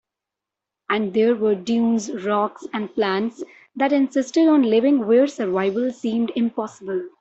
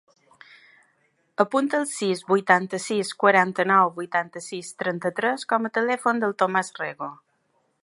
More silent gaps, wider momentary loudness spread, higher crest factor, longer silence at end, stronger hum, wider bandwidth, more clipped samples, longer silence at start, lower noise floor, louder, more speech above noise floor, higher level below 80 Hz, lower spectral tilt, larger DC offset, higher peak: neither; about the same, 11 LU vs 12 LU; second, 14 dB vs 22 dB; second, 0.15 s vs 0.7 s; neither; second, 8.2 kHz vs 11.5 kHz; neither; second, 0.9 s vs 1.4 s; first, -86 dBFS vs -69 dBFS; about the same, -21 LUFS vs -23 LUFS; first, 66 dB vs 46 dB; first, -66 dBFS vs -78 dBFS; about the same, -5.5 dB/octave vs -4.5 dB/octave; neither; second, -6 dBFS vs -2 dBFS